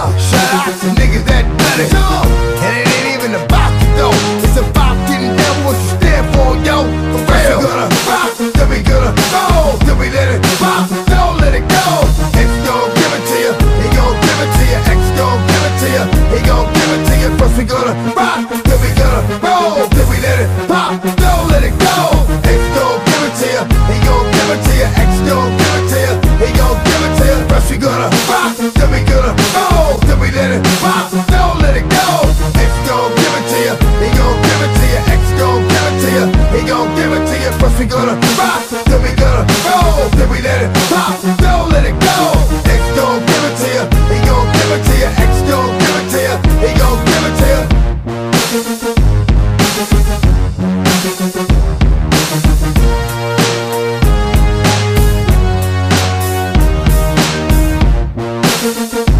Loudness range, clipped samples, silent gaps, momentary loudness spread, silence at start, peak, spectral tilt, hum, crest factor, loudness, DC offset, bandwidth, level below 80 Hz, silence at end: 1 LU; under 0.1%; none; 3 LU; 0 s; 0 dBFS; -5 dB/octave; none; 10 dB; -11 LUFS; under 0.1%; 15.5 kHz; -14 dBFS; 0 s